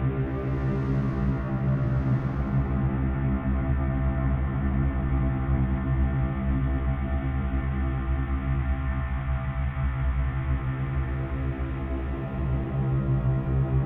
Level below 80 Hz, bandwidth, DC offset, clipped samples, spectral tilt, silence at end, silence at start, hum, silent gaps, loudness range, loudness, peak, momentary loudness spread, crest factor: -30 dBFS; 3.8 kHz; under 0.1%; under 0.1%; -11 dB/octave; 0 s; 0 s; none; none; 3 LU; -28 LUFS; -12 dBFS; 4 LU; 14 dB